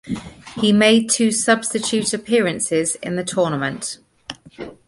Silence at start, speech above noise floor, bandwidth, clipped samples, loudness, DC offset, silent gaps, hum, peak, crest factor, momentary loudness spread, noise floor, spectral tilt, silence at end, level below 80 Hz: 0.05 s; 20 dB; 11.5 kHz; under 0.1%; -18 LUFS; under 0.1%; none; none; -2 dBFS; 18 dB; 20 LU; -38 dBFS; -3.5 dB/octave; 0.15 s; -54 dBFS